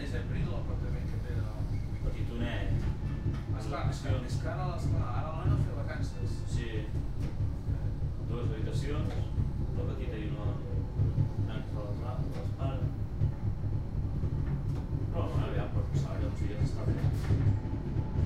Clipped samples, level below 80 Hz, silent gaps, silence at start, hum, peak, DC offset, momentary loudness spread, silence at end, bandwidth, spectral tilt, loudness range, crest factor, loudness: under 0.1%; -38 dBFS; none; 0 s; none; -16 dBFS; under 0.1%; 5 LU; 0 s; 9.8 kHz; -8 dB/octave; 2 LU; 14 dB; -34 LUFS